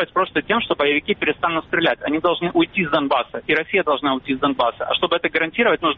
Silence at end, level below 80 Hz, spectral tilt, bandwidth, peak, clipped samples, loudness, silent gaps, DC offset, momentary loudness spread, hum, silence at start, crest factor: 0 s; -52 dBFS; -2 dB/octave; 5.6 kHz; -4 dBFS; under 0.1%; -19 LUFS; none; under 0.1%; 3 LU; none; 0 s; 16 dB